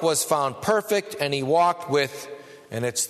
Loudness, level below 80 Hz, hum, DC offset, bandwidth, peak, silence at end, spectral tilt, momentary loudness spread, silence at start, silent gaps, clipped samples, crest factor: -23 LUFS; -64 dBFS; none; under 0.1%; 13.5 kHz; -6 dBFS; 0 s; -3 dB/octave; 15 LU; 0 s; none; under 0.1%; 18 dB